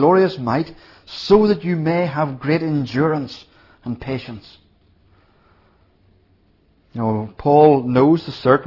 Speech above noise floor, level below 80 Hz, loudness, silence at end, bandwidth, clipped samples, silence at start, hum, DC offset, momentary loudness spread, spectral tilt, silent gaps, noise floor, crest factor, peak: 40 dB; -52 dBFS; -18 LUFS; 0 s; 6 kHz; under 0.1%; 0 s; none; under 0.1%; 20 LU; -8.5 dB/octave; none; -57 dBFS; 18 dB; 0 dBFS